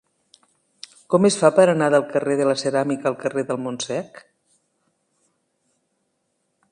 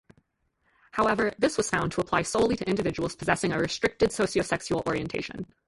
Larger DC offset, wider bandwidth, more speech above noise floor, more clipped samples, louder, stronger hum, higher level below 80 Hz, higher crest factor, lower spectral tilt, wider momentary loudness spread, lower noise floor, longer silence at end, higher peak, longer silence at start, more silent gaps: neither; about the same, 11 kHz vs 11.5 kHz; first, 53 dB vs 46 dB; neither; first, -20 LUFS vs -27 LUFS; neither; second, -70 dBFS vs -52 dBFS; about the same, 22 dB vs 20 dB; about the same, -5 dB/octave vs -4.5 dB/octave; first, 19 LU vs 6 LU; about the same, -72 dBFS vs -73 dBFS; first, 2.55 s vs 0.25 s; first, -2 dBFS vs -8 dBFS; first, 1.1 s vs 0.95 s; neither